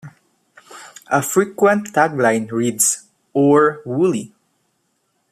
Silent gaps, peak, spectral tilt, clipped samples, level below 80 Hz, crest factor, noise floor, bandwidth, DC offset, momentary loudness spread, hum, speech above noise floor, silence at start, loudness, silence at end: none; -2 dBFS; -4.5 dB/octave; under 0.1%; -64 dBFS; 16 dB; -67 dBFS; 15 kHz; under 0.1%; 12 LU; none; 51 dB; 0.05 s; -17 LUFS; 1.05 s